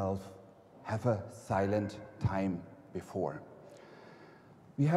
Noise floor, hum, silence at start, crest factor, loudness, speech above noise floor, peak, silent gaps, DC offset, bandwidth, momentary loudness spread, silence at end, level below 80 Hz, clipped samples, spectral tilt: -57 dBFS; none; 0 s; 18 dB; -36 LUFS; 23 dB; -18 dBFS; none; under 0.1%; 13 kHz; 21 LU; 0 s; -60 dBFS; under 0.1%; -8 dB/octave